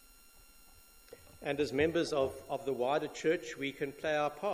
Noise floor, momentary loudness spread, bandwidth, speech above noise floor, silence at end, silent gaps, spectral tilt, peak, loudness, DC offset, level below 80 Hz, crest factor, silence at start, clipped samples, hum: -59 dBFS; 8 LU; 16 kHz; 26 dB; 0 s; none; -5 dB/octave; -16 dBFS; -34 LUFS; under 0.1%; -62 dBFS; 18 dB; 0.35 s; under 0.1%; none